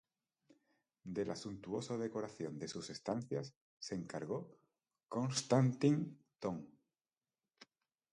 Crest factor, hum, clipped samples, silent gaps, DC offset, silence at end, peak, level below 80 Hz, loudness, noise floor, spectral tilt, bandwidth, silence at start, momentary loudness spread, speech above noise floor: 24 dB; none; under 0.1%; 3.56-3.77 s; under 0.1%; 0.5 s; -18 dBFS; -76 dBFS; -40 LUFS; under -90 dBFS; -6 dB/octave; 11 kHz; 1.05 s; 15 LU; over 51 dB